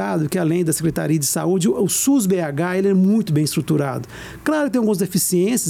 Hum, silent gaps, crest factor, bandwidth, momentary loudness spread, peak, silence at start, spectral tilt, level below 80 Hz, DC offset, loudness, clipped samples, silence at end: none; none; 10 dB; 17 kHz; 5 LU; -8 dBFS; 0 s; -5 dB/octave; -52 dBFS; under 0.1%; -19 LUFS; under 0.1%; 0 s